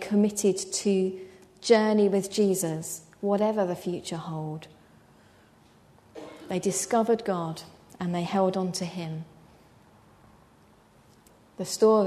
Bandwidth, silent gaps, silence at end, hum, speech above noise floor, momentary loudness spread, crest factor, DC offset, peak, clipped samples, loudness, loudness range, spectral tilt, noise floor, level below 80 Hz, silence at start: 13.5 kHz; none; 0 s; none; 32 dB; 17 LU; 22 dB; under 0.1%; -6 dBFS; under 0.1%; -27 LUFS; 9 LU; -5 dB/octave; -58 dBFS; -68 dBFS; 0 s